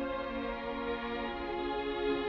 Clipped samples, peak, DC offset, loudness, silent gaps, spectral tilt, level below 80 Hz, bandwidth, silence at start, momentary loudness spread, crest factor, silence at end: under 0.1%; -22 dBFS; under 0.1%; -36 LUFS; none; -2.5 dB/octave; -52 dBFS; 6.4 kHz; 0 s; 3 LU; 14 dB; 0 s